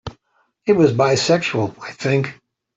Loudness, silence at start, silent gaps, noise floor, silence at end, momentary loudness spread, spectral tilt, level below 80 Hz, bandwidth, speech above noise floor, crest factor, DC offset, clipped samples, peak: -18 LUFS; 0.05 s; none; -65 dBFS; 0.45 s; 13 LU; -5.5 dB/octave; -54 dBFS; 8.2 kHz; 48 dB; 16 dB; under 0.1%; under 0.1%; -2 dBFS